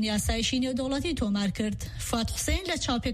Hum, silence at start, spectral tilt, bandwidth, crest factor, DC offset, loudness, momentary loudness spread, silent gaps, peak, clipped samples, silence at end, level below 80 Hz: none; 0 s; -4 dB/octave; 14.5 kHz; 14 dB; under 0.1%; -29 LUFS; 5 LU; none; -16 dBFS; under 0.1%; 0 s; -38 dBFS